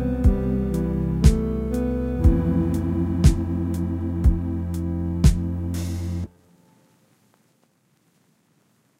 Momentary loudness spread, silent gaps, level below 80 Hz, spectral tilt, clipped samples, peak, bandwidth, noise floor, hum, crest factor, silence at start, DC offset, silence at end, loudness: 8 LU; none; -26 dBFS; -8 dB/octave; under 0.1%; 0 dBFS; 15.5 kHz; -64 dBFS; none; 22 dB; 0 s; under 0.1%; 2.75 s; -23 LUFS